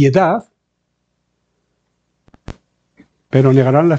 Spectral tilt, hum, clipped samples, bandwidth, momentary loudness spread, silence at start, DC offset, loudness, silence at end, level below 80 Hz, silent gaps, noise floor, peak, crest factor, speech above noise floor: -8.5 dB/octave; none; under 0.1%; 7.4 kHz; 26 LU; 0 s; under 0.1%; -13 LUFS; 0 s; -50 dBFS; none; -70 dBFS; 0 dBFS; 16 dB; 59 dB